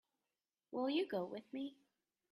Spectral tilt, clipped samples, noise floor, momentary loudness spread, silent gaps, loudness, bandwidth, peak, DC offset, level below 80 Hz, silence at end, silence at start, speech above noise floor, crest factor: -6.5 dB/octave; under 0.1%; under -90 dBFS; 10 LU; none; -43 LUFS; 13.5 kHz; -28 dBFS; under 0.1%; -90 dBFS; 0.6 s; 0.7 s; over 49 dB; 16 dB